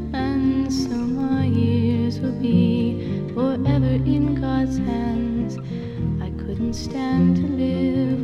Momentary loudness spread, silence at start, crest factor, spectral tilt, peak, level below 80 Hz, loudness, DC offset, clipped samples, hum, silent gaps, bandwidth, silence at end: 7 LU; 0 s; 14 dB; -8 dB/octave; -6 dBFS; -36 dBFS; -22 LUFS; under 0.1%; under 0.1%; none; none; 8.2 kHz; 0 s